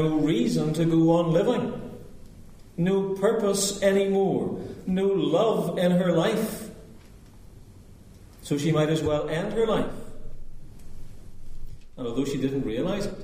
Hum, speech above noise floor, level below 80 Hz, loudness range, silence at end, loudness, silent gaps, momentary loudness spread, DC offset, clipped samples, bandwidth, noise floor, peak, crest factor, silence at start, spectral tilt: none; 24 dB; -44 dBFS; 7 LU; 0 s; -25 LUFS; none; 14 LU; under 0.1%; under 0.1%; 15.5 kHz; -48 dBFS; -10 dBFS; 16 dB; 0 s; -6 dB/octave